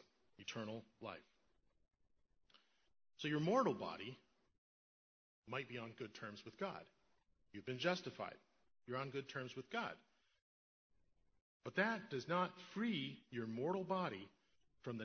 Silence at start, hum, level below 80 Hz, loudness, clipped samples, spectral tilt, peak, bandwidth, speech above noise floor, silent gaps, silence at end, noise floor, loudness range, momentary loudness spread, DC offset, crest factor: 0.4 s; none; -84 dBFS; -45 LUFS; under 0.1%; -4 dB/octave; -22 dBFS; 6.4 kHz; 37 dB; 4.58-5.42 s, 10.42-10.90 s, 11.41-11.60 s; 0 s; -81 dBFS; 9 LU; 15 LU; under 0.1%; 24 dB